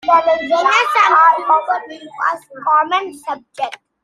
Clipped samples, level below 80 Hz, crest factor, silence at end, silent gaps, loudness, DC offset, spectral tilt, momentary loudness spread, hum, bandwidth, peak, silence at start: under 0.1%; -62 dBFS; 14 dB; 0.3 s; none; -14 LUFS; under 0.1%; -1.5 dB/octave; 15 LU; none; 13.5 kHz; -2 dBFS; 0.05 s